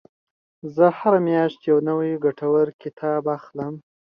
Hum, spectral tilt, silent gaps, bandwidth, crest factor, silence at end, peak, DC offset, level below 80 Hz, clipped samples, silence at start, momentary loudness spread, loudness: none; -10 dB/octave; 2.74-2.79 s, 2.93-2.97 s; 5.6 kHz; 18 dB; 0.35 s; -4 dBFS; under 0.1%; -68 dBFS; under 0.1%; 0.65 s; 13 LU; -21 LUFS